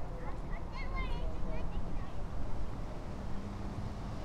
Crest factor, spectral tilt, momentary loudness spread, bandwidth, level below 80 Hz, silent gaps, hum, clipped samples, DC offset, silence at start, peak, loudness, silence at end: 12 dB; -7 dB/octave; 4 LU; 8.4 kHz; -40 dBFS; none; none; under 0.1%; under 0.1%; 0 s; -22 dBFS; -43 LUFS; 0 s